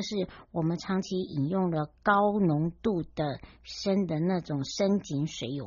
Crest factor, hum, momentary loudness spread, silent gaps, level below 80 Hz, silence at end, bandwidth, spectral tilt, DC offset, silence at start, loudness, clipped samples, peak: 18 dB; none; 9 LU; none; -56 dBFS; 0 s; 7.2 kHz; -6 dB/octave; under 0.1%; 0 s; -29 LUFS; under 0.1%; -10 dBFS